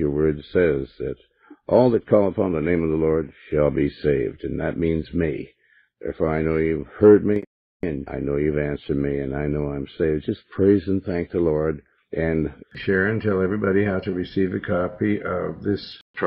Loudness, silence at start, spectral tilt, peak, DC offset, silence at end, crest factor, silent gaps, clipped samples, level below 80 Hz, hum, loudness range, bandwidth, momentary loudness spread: -22 LUFS; 0 s; -11 dB/octave; -2 dBFS; under 0.1%; 0 s; 18 dB; 7.47-7.80 s, 16.01-16.14 s; under 0.1%; -42 dBFS; none; 3 LU; 5.6 kHz; 11 LU